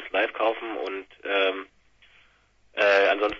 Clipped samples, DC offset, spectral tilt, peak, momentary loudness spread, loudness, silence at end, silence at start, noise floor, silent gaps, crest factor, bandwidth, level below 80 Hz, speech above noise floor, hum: under 0.1%; under 0.1%; -3 dB/octave; -8 dBFS; 16 LU; -24 LUFS; 0 s; 0 s; -61 dBFS; none; 18 dB; 7.4 kHz; -62 dBFS; 34 dB; none